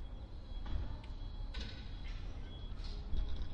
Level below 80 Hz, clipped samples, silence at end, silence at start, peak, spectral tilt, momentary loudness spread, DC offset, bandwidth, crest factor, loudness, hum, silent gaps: -42 dBFS; under 0.1%; 0 s; 0 s; -24 dBFS; -6 dB/octave; 6 LU; under 0.1%; 7 kHz; 16 dB; -47 LUFS; none; none